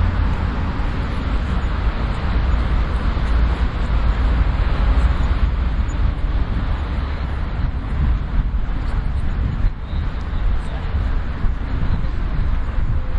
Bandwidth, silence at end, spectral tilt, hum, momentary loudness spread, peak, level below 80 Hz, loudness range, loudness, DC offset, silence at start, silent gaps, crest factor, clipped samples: 7.4 kHz; 0 s; -8 dB/octave; none; 5 LU; -6 dBFS; -20 dBFS; 4 LU; -22 LUFS; under 0.1%; 0 s; none; 12 dB; under 0.1%